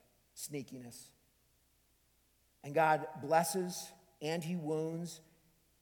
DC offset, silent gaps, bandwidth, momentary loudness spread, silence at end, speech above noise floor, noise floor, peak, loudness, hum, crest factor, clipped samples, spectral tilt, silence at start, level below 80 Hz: under 0.1%; none; 19 kHz; 21 LU; 0.6 s; 37 dB; -73 dBFS; -16 dBFS; -36 LUFS; none; 22 dB; under 0.1%; -4.5 dB/octave; 0.35 s; -78 dBFS